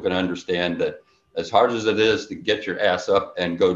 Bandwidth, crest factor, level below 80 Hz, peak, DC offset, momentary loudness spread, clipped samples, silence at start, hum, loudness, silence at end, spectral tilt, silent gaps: 7.8 kHz; 18 dB; -54 dBFS; -4 dBFS; under 0.1%; 7 LU; under 0.1%; 0 s; none; -22 LUFS; 0 s; -5 dB/octave; none